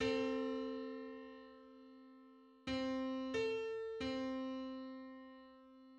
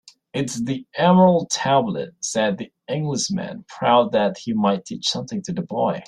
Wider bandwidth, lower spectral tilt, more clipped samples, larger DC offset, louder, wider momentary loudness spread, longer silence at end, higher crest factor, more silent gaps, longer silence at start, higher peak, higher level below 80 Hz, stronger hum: second, 8.8 kHz vs 11 kHz; about the same, -5 dB/octave vs -5 dB/octave; neither; neither; second, -43 LUFS vs -21 LUFS; first, 21 LU vs 11 LU; about the same, 0 s vs 0.05 s; about the same, 18 dB vs 18 dB; neither; second, 0 s vs 0.35 s; second, -26 dBFS vs -2 dBFS; second, -70 dBFS vs -62 dBFS; neither